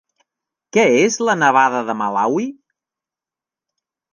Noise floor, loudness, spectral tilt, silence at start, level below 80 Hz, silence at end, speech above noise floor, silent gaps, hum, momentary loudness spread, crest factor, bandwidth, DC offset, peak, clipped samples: -89 dBFS; -16 LUFS; -4 dB/octave; 0.75 s; -74 dBFS; 1.6 s; 73 dB; none; none; 8 LU; 18 dB; 10 kHz; under 0.1%; -2 dBFS; under 0.1%